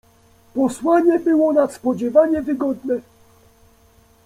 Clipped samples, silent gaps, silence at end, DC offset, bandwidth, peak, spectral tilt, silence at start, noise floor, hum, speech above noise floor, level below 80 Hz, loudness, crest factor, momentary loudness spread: under 0.1%; none; 1.25 s; under 0.1%; 14 kHz; -2 dBFS; -6.5 dB/octave; 0.55 s; -53 dBFS; none; 36 dB; -56 dBFS; -18 LUFS; 16 dB; 9 LU